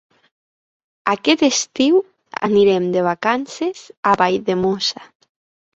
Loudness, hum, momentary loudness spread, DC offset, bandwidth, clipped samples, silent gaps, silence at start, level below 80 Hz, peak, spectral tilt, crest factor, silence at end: -18 LUFS; none; 10 LU; under 0.1%; 8 kHz; under 0.1%; 3.97-4.03 s; 1.05 s; -58 dBFS; -2 dBFS; -4 dB/octave; 18 dB; 0.7 s